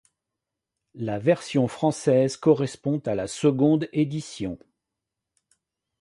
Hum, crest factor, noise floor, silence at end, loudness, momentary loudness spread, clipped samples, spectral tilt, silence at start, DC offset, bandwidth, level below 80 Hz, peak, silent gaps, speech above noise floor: none; 20 dB; -85 dBFS; 1.45 s; -24 LUFS; 12 LU; under 0.1%; -6.5 dB/octave; 0.95 s; under 0.1%; 11.5 kHz; -60 dBFS; -6 dBFS; none; 62 dB